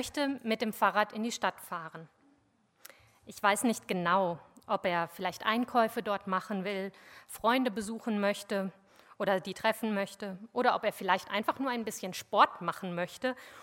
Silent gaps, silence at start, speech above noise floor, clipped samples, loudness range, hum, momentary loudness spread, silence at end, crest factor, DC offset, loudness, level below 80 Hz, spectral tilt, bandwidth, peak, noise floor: none; 0 s; 38 dB; under 0.1%; 3 LU; none; 10 LU; 0 s; 22 dB; under 0.1%; -32 LUFS; -72 dBFS; -4 dB/octave; 17 kHz; -10 dBFS; -70 dBFS